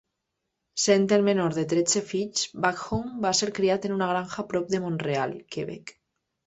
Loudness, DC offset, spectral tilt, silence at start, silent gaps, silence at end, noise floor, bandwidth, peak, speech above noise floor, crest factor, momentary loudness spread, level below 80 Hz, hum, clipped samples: -26 LUFS; under 0.1%; -4 dB/octave; 0.75 s; none; 0.55 s; -81 dBFS; 8.2 kHz; -6 dBFS; 56 dB; 20 dB; 13 LU; -58 dBFS; none; under 0.1%